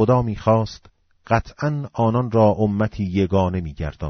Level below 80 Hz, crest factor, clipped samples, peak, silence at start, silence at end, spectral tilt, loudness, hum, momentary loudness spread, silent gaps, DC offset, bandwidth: -40 dBFS; 16 dB; under 0.1%; -4 dBFS; 0 s; 0 s; -7.5 dB/octave; -21 LUFS; none; 8 LU; none; under 0.1%; 6.6 kHz